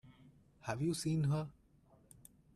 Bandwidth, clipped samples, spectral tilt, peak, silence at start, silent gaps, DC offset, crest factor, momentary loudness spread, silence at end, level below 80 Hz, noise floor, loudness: 14 kHz; under 0.1%; -6 dB/octave; -22 dBFS; 0.05 s; none; under 0.1%; 18 dB; 25 LU; 1.05 s; -68 dBFS; -68 dBFS; -38 LUFS